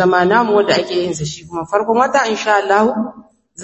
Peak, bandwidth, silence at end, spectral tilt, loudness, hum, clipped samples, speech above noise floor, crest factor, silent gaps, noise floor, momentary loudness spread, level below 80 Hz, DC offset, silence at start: 0 dBFS; 8.4 kHz; 0 s; -4.5 dB/octave; -15 LUFS; none; under 0.1%; 25 dB; 14 dB; none; -40 dBFS; 11 LU; -52 dBFS; under 0.1%; 0 s